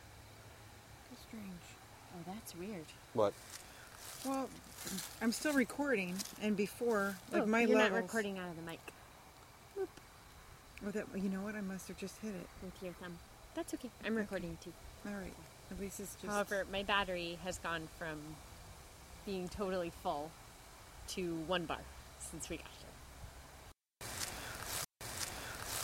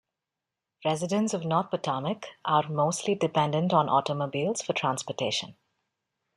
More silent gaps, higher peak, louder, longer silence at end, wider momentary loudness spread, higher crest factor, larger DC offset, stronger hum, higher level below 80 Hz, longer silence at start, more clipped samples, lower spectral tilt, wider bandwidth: neither; second, -18 dBFS vs -10 dBFS; second, -40 LUFS vs -28 LUFS; second, 0 s vs 0.85 s; first, 20 LU vs 7 LU; about the same, 24 dB vs 20 dB; neither; neither; first, -60 dBFS vs -72 dBFS; second, 0 s vs 0.8 s; neither; about the same, -4 dB/octave vs -5 dB/octave; first, 16.5 kHz vs 12.5 kHz